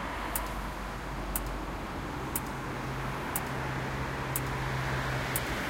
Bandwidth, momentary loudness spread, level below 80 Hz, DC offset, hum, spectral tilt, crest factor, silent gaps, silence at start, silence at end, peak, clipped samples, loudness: 17 kHz; 6 LU; -42 dBFS; under 0.1%; none; -4.5 dB/octave; 22 dB; none; 0 s; 0 s; -12 dBFS; under 0.1%; -34 LUFS